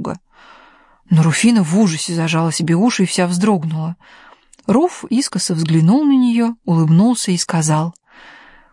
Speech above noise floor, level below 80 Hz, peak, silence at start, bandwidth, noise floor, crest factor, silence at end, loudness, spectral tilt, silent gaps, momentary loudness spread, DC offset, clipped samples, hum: 33 dB; -58 dBFS; -2 dBFS; 0 s; 11.5 kHz; -48 dBFS; 14 dB; 0.8 s; -15 LUFS; -5.5 dB/octave; none; 10 LU; under 0.1%; under 0.1%; none